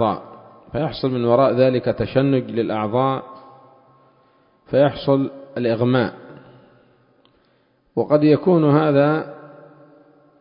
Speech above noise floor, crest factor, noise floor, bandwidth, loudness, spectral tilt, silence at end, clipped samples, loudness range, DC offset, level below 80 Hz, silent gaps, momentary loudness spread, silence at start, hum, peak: 43 dB; 18 dB; -61 dBFS; 5.4 kHz; -19 LUFS; -12.5 dB/octave; 0.95 s; under 0.1%; 3 LU; under 0.1%; -54 dBFS; none; 12 LU; 0 s; none; -2 dBFS